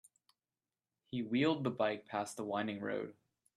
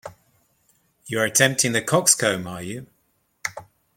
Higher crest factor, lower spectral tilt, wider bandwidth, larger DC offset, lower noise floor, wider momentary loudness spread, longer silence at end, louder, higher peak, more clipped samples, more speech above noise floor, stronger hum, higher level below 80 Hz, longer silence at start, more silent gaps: about the same, 20 dB vs 24 dB; first, -5.5 dB/octave vs -2.5 dB/octave; second, 13.5 kHz vs 16.5 kHz; neither; first, under -90 dBFS vs -68 dBFS; second, 9 LU vs 16 LU; about the same, 0.45 s vs 0.35 s; second, -37 LUFS vs -20 LUFS; second, -20 dBFS vs -2 dBFS; neither; first, over 53 dB vs 47 dB; neither; second, -80 dBFS vs -64 dBFS; first, 1.1 s vs 0.05 s; neither